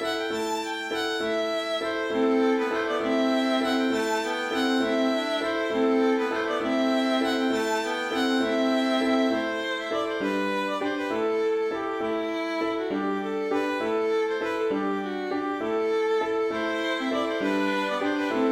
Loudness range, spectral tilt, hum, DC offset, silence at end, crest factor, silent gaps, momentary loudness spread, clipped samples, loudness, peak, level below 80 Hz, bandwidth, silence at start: 3 LU; -4 dB/octave; none; under 0.1%; 0 s; 14 dB; none; 5 LU; under 0.1%; -26 LUFS; -12 dBFS; -64 dBFS; 16 kHz; 0 s